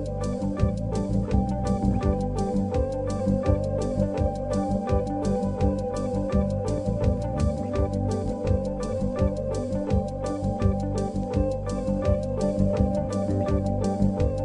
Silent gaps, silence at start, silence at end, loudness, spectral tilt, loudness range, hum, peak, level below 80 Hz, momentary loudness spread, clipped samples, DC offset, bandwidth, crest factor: none; 0 s; 0 s; -26 LUFS; -8.5 dB/octave; 1 LU; none; -8 dBFS; -32 dBFS; 4 LU; under 0.1%; under 0.1%; 10.5 kHz; 16 dB